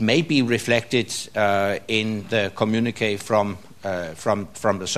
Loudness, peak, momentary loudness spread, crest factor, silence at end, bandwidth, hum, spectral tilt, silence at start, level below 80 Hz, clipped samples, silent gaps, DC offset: -22 LUFS; -4 dBFS; 7 LU; 18 dB; 0 s; 14 kHz; none; -4.5 dB/octave; 0 s; -58 dBFS; under 0.1%; none; 0.5%